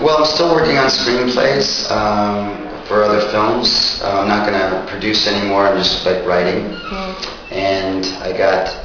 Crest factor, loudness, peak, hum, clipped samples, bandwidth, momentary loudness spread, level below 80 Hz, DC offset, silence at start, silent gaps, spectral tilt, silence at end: 16 dB; -15 LUFS; 0 dBFS; none; under 0.1%; 5.4 kHz; 10 LU; -38 dBFS; under 0.1%; 0 s; none; -4 dB/octave; 0 s